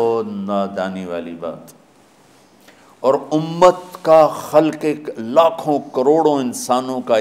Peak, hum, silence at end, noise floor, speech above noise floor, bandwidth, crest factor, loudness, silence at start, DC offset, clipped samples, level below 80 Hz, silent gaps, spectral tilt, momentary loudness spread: 0 dBFS; none; 0 s; -50 dBFS; 34 dB; 16 kHz; 18 dB; -17 LUFS; 0 s; under 0.1%; under 0.1%; -62 dBFS; none; -5.5 dB/octave; 13 LU